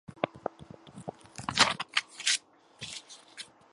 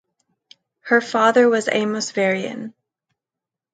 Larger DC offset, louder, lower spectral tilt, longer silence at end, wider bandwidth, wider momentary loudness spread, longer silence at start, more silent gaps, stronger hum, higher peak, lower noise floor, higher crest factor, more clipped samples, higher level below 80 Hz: neither; second, -30 LUFS vs -18 LUFS; second, -1 dB/octave vs -4 dB/octave; second, 0.3 s vs 1.05 s; first, 11.5 kHz vs 9.2 kHz; about the same, 21 LU vs 19 LU; second, 0.1 s vs 0.85 s; neither; neither; second, -6 dBFS vs -2 dBFS; second, -51 dBFS vs -87 dBFS; first, 28 dB vs 18 dB; neither; first, -66 dBFS vs -74 dBFS